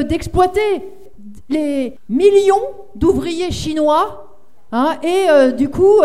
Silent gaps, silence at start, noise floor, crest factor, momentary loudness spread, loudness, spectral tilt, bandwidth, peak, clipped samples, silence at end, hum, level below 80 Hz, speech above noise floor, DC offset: none; 0 s; -39 dBFS; 14 dB; 11 LU; -15 LUFS; -5.5 dB/octave; 13.5 kHz; 0 dBFS; under 0.1%; 0 s; none; -38 dBFS; 25 dB; 2%